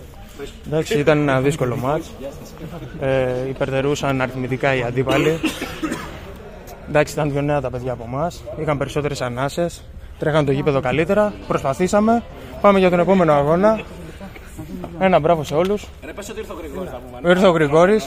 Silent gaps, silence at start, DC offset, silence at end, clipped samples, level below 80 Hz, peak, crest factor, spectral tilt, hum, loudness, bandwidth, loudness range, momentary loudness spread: none; 0 s; under 0.1%; 0 s; under 0.1%; -40 dBFS; -2 dBFS; 18 dB; -6 dB/octave; none; -19 LUFS; 16 kHz; 6 LU; 20 LU